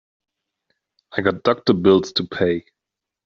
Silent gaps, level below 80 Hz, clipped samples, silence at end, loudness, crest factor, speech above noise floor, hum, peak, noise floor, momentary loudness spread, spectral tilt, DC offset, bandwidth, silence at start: none; -58 dBFS; under 0.1%; 0.65 s; -19 LUFS; 20 dB; 55 dB; none; -2 dBFS; -73 dBFS; 9 LU; -6 dB/octave; under 0.1%; 7.2 kHz; 1.15 s